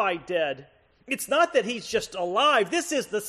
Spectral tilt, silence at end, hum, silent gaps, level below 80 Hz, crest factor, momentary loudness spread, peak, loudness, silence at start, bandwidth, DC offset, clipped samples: -2.5 dB/octave; 0 s; none; none; -64 dBFS; 16 dB; 10 LU; -10 dBFS; -25 LUFS; 0 s; 14 kHz; under 0.1%; under 0.1%